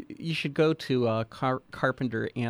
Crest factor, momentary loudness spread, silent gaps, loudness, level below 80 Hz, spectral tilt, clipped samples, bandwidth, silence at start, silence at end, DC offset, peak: 16 dB; 5 LU; none; -28 LUFS; -64 dBFS; -7 dB/octave; under 0.1%; 14 kHz; 0 s; 0 s; under 0.1%; -12 dBFS